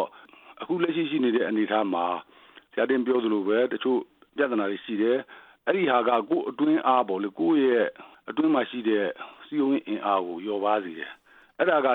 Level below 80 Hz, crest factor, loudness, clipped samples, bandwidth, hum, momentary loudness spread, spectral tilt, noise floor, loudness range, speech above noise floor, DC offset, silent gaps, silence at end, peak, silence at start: -80 dBFS; 18 dB; -26 LUFS; under 0.1%; 4.2 kHz; none; 11 LU; -8.5 dB/octave; -51 dBFS; 3 LU; 26 dB; under 0.1%; none; 0 s; -8 dBFS; 0 s